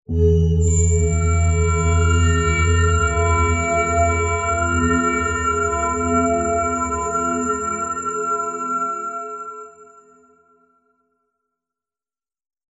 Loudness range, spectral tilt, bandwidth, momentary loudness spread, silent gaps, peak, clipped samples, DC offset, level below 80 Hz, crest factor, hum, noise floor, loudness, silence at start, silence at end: 10 LU; -5.5 dB/octave; 7.8 kHz; 6 LU; none; -6 dBFS; under 0.1%; under 0.1%; -28 dBFS; 14 dB; none; under -90 dBFS; -19 LUFS; 0.1 s; 2.85 s